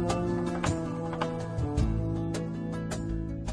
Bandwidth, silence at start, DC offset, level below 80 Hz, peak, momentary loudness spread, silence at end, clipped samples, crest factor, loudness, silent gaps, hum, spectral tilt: 11 kHz; 0 s; under 0.1%; -40 dBFS; -14 dBFS; 5 LU; 0 s; under 0.1%; 16 dB; -32 LUFS; none; none; -6.5 dB/octave